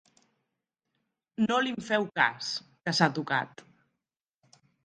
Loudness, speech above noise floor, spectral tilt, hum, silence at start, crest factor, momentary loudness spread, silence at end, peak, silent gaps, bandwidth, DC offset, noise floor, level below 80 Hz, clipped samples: -28 LUFS; 59 dB; -4.5 dB/octave; none; 1.4 s; 26 dB; 9 LU; 1.4 s; -6 dBFS; none; 10 kHz; under 0.1%; -88 dBFS; -76 dBFS; under 0.1%